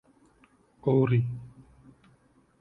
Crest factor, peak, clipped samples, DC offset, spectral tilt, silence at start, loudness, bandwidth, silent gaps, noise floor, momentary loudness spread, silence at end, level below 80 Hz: 18 dB; -12 dBFS; under 0.1%; under 0.1%; -10.5 dB/octave; 0.85 s; -27 LUFS; 4 kHz; none; -63 dBFS; 20 LU; 1.15 s; -60 dBFS